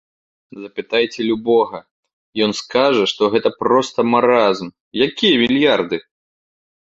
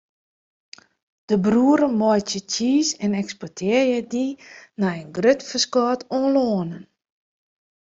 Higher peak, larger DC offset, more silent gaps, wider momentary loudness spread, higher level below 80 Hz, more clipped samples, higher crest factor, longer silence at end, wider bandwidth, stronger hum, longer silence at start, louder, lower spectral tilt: about the same, -2 dBFS vs -4 dBFS; neither; first, 1.91-2.03 s, 2.13-2.33 s, 4.80-4.91 s vs none; about the same, 13 LU vs 11 LU; about the same, -58 dBFS vs -62 dBFS; neither; about the same, 16 dB vs 18 dB; second, 0.8 s vs 1.05 s; about the same, 8 kHz vs 7.8 kHz; neither; second, 0.55 s vs 1.3 s; first, -16 LUFS vs -21 LUFS; about the same, -4.5 dB/octave vs -4.5 dB/octave